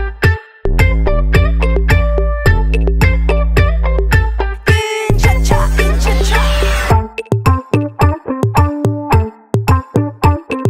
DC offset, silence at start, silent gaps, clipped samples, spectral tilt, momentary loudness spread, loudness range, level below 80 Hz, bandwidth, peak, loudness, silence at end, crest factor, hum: under 0.1%; 0 s; none; under 0.1%; -6 dB/octave; 4 LU; 1 LU; -14 dBFS; 15.5 kHz; 0 dBFS; -14 LUFS; 0 s; 12 dB; none